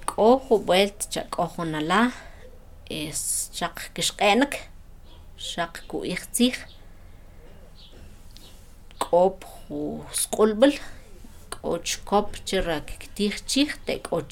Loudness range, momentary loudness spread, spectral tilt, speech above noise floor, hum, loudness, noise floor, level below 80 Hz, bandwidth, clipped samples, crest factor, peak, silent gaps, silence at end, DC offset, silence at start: 6 LU; 15 LU; -3.5 dB/octave; 21 dB; none; -25 LUFS; -45 dBFS; -44 dBFS; 17.5 kHz; under 0.1%; 22 dB; -4 dBFS; none; 0 s; under 0.1%; 0 s